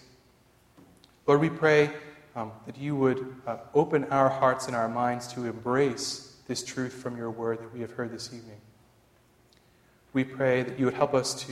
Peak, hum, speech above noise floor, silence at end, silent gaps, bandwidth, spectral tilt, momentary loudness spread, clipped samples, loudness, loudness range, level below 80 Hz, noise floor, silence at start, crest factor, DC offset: -8 dBFS; none; 35 dB; 0 s; none; 14 kHz; -5 dB/octave; 15 LU; under 0.1%; -28 LUFS; 9 LU; -66 dBFS; -62 dBFS; 1.25 s; 22 dB; under 0.1%